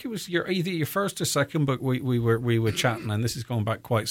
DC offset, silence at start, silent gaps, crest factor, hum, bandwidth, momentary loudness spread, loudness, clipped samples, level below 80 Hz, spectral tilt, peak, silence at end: under 0.1%; 0 s; none; 16 dB; none; 17 kHz; 5 LU; -26 LUFS; under 0.1%; -56 dBFS; -5 dB/octave; -10 dBFS; 0 s